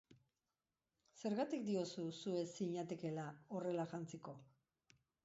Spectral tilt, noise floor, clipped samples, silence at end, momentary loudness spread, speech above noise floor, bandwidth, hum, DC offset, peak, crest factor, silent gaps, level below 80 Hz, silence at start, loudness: -6 dB/octave; under -90 dBFS; under 0.1%; 0.8 s; 9 LU; over 46 dB; 7.6 kHz; none; under 0.1%; -30 dBFS; 16 dB; none; -86 dBFS; 0.1 s; -45 LUFS